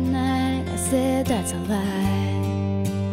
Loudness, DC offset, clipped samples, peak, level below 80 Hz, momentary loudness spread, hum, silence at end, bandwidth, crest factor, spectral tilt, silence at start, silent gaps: -23 LUFS; under 0.1%; under 0.1%; -10 dBFS; -42 dBFS; 3 LU; none; 0 s; 16 kHz; 12 dB; -6 dB/octave; 0 s; none